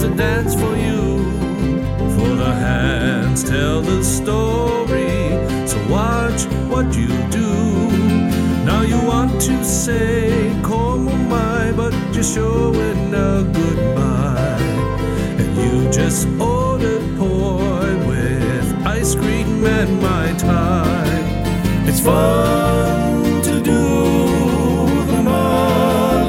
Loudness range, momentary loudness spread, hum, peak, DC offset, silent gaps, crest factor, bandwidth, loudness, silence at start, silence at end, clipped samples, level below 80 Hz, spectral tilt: 2 LU; 4 LU; none; -2 dBFS; under 0.1%; none; 14 dB; 16.5 kHz; -17 LUFS; 0 s; 0 s; under 0.1%; -26 dBFS; -6 dB/octave